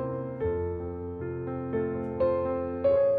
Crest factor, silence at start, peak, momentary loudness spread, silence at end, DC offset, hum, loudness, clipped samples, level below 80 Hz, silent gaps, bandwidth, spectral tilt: 14 dB; 0 s; -16 dBFS; 9 LU; 0 s; under 0.1%; none; -30 LUFS; under 0.1%; -50 dBFS; none; 4.6 kHz; -11.5 dB/octave